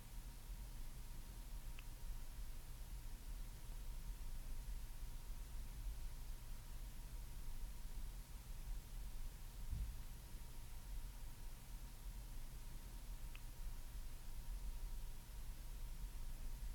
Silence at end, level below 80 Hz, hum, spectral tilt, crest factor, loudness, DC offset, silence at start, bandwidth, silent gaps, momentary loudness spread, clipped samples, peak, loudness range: 0 s; -50 dBFS; none; -4 dB/octave; 16 dB; -55 LUFS; under 0.1%; 0 s; 19.5 kHz; none; 3 LU; under 0.1%; -34 dBFS; 2 LU